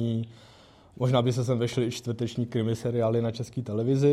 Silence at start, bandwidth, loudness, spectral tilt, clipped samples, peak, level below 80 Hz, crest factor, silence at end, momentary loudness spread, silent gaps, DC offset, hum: 0 s; 13 kHz; -28 LUFS; -7 dB/octave; under 0.1%; -10 dBFS; -62 dBFS; 16 dB; 0 s; 7 LU; none; under 0.1%; none